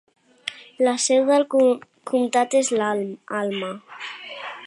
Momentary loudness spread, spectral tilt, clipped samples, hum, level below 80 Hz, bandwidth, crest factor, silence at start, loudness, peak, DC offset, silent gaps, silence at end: 16 LU; -3 dB/octave; under 0.1%; none; -80 dBFS; 11.5 kHz; 16 dB; 0.45 s; -21 LUFS; -6 dBFS; under 0.1%; none; 0 s